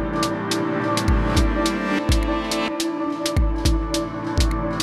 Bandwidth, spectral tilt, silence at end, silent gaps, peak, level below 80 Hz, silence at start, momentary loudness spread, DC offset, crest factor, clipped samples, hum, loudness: 13.5 kHz; -5 dB/octave; 0 s; none; -6 dBFS; -26 dBFS; 0 s; 4 LU; under 0.1%; 16 dB; under 0.1%; none; -22 LUFS